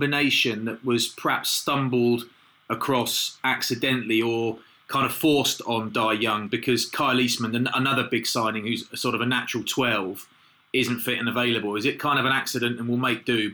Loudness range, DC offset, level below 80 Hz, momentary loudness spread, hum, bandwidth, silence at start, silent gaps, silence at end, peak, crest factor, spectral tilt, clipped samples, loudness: 2 LU; under 0.1%; -66 dBFS; 6 LU; none; over 20 kHz; 0 s; none; 0 s; -12 dBFS; 12 dB; -3.5 dB/octave; under 0.1%; -24 LUFS